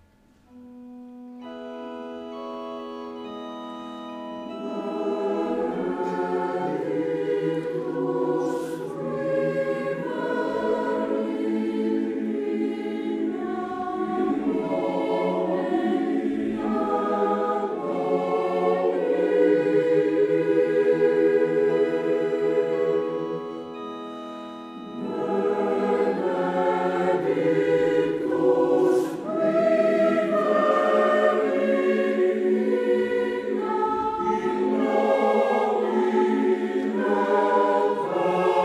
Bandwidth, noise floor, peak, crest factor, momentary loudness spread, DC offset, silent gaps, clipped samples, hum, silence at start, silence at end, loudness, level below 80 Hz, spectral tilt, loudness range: 11.5 kHz; -58 dBFS; -8 dBFS; 16 dB; 15 LU; under 0.1%; none; under 0.1%; none; 0.55 s; 0 s; -24 LUFS; -64 dBFS; -7 dB/octave; 7 LU